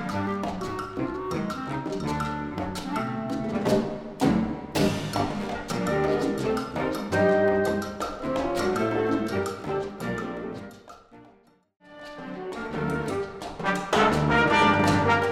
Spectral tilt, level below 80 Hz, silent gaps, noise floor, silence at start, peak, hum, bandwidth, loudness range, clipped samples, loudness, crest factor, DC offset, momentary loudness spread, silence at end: -5.5 dB/octave; -48 dBFS; none; -58 dBFS; 0 s; -8 dBFS; none; 16 kHz; 9 LU; under 0.1%; -26 LUFS; 18 dB; under 0.1%; 12 LU; 0 s